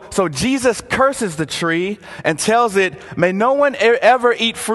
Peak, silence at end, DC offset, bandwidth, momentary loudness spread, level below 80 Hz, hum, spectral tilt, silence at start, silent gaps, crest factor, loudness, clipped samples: 0 dBFS; 0 s; under 0.1%; 12.5 kHz; 8 LU; -48 dBFS; none; -4 dB/octave; 0 s; none; 16 dB; -16 LUFS; under 0.1%